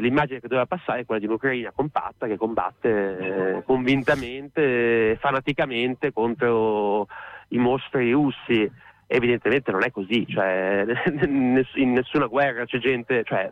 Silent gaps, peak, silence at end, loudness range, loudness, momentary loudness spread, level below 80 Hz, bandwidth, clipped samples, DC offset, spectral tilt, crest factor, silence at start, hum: none; -10 dBFS; 0 s; 2 LU; -23 LUFS; 6 LU; -54 dBFS; 8.4 kHz; under 0.1%; under 0.1%; -7.5 dB/octave; 14 dB; 0 s; none